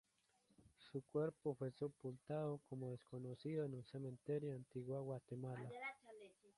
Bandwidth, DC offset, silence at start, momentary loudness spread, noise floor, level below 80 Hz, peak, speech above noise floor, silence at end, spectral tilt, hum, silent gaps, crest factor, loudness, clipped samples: 11.5 kHz; under 0.1%; 0.6 s; 8 LU; -81 dBFS; -82 dBFS; -30 dBFS; 33 dB; 0.1 s; -8.5 dB/octave; none; none; 18 dB; -49 LUFS; under 0.1%